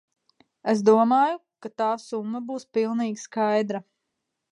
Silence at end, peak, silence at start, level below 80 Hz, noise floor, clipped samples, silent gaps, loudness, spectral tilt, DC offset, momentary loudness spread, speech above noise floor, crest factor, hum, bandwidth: 0.7 s; -6 dBFS; 0.65 s; -80 dBFS; -81 dBFS; under 0.1%; none; -24 LUFS; -6 dB/octave; under 0.1%; 14 LU; 57 dB; 20 dB; none; 11 kHz